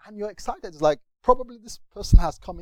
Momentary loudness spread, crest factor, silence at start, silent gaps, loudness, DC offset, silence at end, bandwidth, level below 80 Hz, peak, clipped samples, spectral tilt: 17 LU; 22 dB; 0.15 s; none; -24 LUFS; under 0.1%; 0 s; 10 kHz; -26 dBFS; 0 dBFS; under 0.1%; -6.5 dB/octave